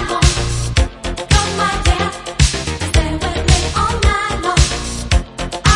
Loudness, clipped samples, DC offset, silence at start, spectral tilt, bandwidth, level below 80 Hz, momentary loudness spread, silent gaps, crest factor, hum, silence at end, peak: -16 LUFS; under 0.1%; under 0.1%; 0 s; -4 dB/octave; 11.5 kHz; -20 dBFS; 6 LU; none; 16 dB; none; 0 s; 0 dBFS